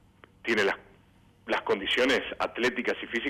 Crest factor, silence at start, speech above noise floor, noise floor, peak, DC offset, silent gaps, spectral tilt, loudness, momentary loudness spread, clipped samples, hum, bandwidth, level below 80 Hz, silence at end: 12 dB; 0.45 s; 32 dB; -60 dBFS; -18 dBFS; under 0.1%; none; -3.5 dB/octave; -28 LUFS; 11 LU; under 0.1%; none; 16 kHz; -62 dBFS; 0 s